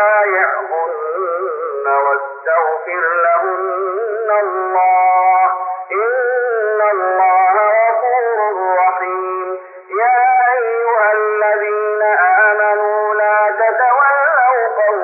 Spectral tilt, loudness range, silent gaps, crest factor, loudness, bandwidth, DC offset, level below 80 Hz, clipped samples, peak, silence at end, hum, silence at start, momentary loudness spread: -1 dB/octave; 3 LU; none; 12 dB; -14 LUFS; 2.9 kHz; under 0.1%; under -90 dBFS; under 0.1%; -2 dBFS; 0 s; none; 0 s; 8 LU